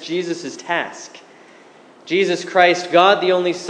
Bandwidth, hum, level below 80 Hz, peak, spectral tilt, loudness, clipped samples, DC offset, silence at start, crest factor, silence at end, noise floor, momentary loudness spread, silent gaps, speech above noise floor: 10 kHz; none; -80 dBFS; 0 dBFS; -4 dB/octave; -17 LUFS; under 0.1%; under 0.1%; 0 s; 18 dB; 0 s; -46 dBFS; 15 LU; none; 28 dB